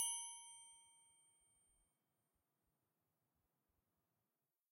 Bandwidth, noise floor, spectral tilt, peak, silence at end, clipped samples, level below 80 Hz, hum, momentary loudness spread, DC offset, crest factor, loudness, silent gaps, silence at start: 16 kHz; under -90 dBFS; 4 dB/octave; -30 dBFS; 3.65 s; under 0.1%; under -90 dBFS; none; 24 LU; under 0.1%; 26 dB; -48 LUFS; none; 0 s